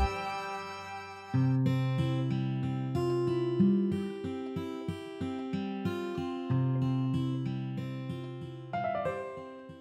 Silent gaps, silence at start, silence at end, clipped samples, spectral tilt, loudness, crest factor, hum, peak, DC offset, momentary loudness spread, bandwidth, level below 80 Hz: none; 0 s; 0 s; under 0.1%; -8 dB/octave; -33 LUFS; 16 dB; none; -16 dBFS; under 0.1%; 12 LU; 9.2 kHz; -50 dBFS